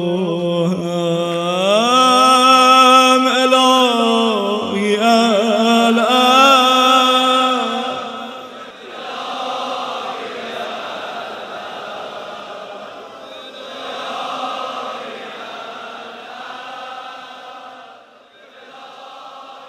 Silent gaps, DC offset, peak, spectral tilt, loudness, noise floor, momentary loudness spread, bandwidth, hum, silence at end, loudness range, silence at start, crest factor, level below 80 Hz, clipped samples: none; under 0.1%; 0 dBFS; -3.5 dB/octave; -13 LUFS; -45 dBFS; 23 LU; 16 kHz; none; 0 s; 20 LU; 0 s; 16 dB; -70 dBFS; under 0.1%